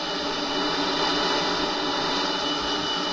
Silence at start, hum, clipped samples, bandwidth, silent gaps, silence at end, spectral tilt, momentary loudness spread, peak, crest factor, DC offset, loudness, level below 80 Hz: 0 s; none; under 0.1%; 9.2 kHz; none; 0 s; -2.5 dB/octave; 3 LU; -12 dBFS; 14 dB; under 0.1%; -24 LUFS; -50 dBFS